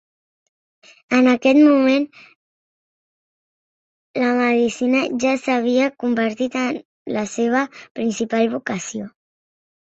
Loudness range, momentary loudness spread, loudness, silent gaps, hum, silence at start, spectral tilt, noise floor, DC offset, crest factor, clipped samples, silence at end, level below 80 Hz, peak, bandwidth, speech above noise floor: 4 LU; 14 LU; -19 LUFS; 2.36-4.14 s, 6.85-7.06 s, 7.91-7.95 s; none; 1.1 s; -4.5 dB/octave; under -90 dBFS; under 0.1%; 16 dB; under 0.1%; 0.9 s; -64 dBFS; -4 dBFS; 8 kHz; over 72 dB